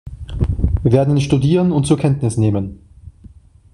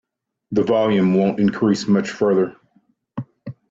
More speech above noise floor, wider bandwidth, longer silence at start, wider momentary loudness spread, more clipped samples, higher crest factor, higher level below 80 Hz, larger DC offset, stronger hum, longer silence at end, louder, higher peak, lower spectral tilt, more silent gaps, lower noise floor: second, 28 dB vs 44 dB; first, 11.5 kHz vs 7.8 kHz; second, 0.05 s vs 0.5 s; second, 9 LU vs 17 LU; neither; about the same, 14 dB vs 14 dB; first, -28 dBFS vs -58 dBFS; neither; neither; first, 0.45 s vs 0.2 s; about the same, -16 LUFS vs -18 LUFS; first, -2 dBFS vs -6 dBFS; about the same, -7.5 dB/octave vs -7 dB/octave; neither; second, -43 dBFS vs -61 dBFS